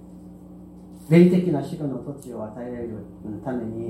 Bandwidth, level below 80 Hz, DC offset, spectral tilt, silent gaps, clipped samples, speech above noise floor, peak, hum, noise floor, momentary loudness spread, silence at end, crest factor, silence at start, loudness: 12 kHz; -54 dBFS; under 0.1%; -9 dB/octave; none; under 0.1%; 20 dB; -4 dBFS; none; -43 dBFS; 27 LU; 0 s; 20 dB; 0 s; -23 LUFS